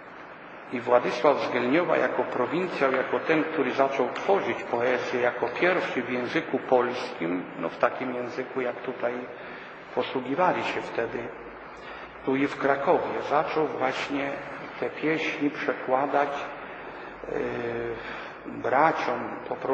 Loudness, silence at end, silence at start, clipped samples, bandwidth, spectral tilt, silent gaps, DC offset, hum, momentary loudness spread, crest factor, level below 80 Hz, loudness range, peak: -27 LUFS; 0 s; 0 s; under 0.1%; 8.4 kHz; -6 dB/octave; none; under 0.1%; none; 15 LU; 22 dB; -64 dBFS; 5 LU; -6 dBFS